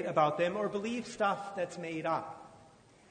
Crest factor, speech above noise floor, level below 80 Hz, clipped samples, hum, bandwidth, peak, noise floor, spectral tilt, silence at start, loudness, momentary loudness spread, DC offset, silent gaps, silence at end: 20 dB; 27 dB; -72 dBFS; under 0.1%; none; 9.6 kHz; -14 dBFS; -60 dBFS; -5.5 dB/octave; 0 s; -34 LUFS; 9 LU; under 0.1%; none; 0.45 s